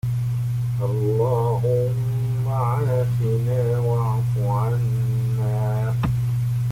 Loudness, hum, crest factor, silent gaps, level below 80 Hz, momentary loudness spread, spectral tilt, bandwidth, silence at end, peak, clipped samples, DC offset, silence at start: -22 LUFS; 50 Hz at -40 dBFS; 10 dB; none; -44 dBFS; 3 LU; -8.5 dB/octave; 15.5 kHz; 0 s; -10 dBFS; under 0.1%; under 0.1%; 0.05 s